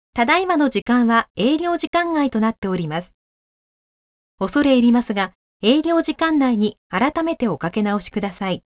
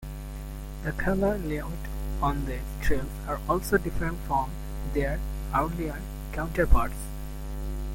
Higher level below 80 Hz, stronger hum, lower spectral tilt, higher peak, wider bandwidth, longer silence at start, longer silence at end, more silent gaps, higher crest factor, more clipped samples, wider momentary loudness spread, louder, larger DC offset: second, -52 dBFS vs -32 dBFS; neither; first, -10 dB/octave vs -6.5 dB/octave; first, -2 dBFS vs -8 dBFS; second, 4 kHz vs 17 kHz; first, 0.15 s vs 0 s; first, 0.15 s vs 0 s; first, 0.82-0.86 s, 1.30-1.35 s, 1.87-1.93 s, 2.58-2.62 s, 3.14-4.38 s, 5.35-5.60 s, 6.77-6.90 s vs none; about the same, 16 dB vs 20 dB; neither; second, 8 LU vs 12 LU; first, -19 LUFS vs -30 LUFS; neither